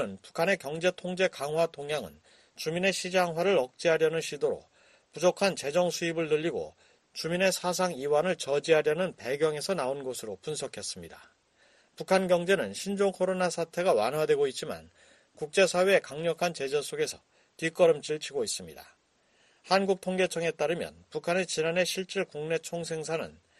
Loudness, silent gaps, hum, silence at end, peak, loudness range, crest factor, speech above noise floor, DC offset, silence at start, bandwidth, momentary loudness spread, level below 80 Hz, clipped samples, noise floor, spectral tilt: -29 LUFS; none; none; 0.3 s; -10 dBFS; 3 LU; 20 dB; 39 dB; under 0.1%; 0 s; 13 kHz; 12 LU; -70 dBFS; under 0.1%; -68 dBFS; -4 dB/octave